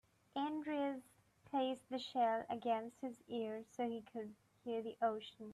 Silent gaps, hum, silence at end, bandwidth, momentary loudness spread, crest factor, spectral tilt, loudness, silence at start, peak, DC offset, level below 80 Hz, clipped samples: none; none; 0 s; 13 kHz; 12 LU; 18 dB; -5.5 dB/octave; -42 LUFS; 0.35 s; -26 dBFS; under 0.1%; -84 dBFS; under 0.1%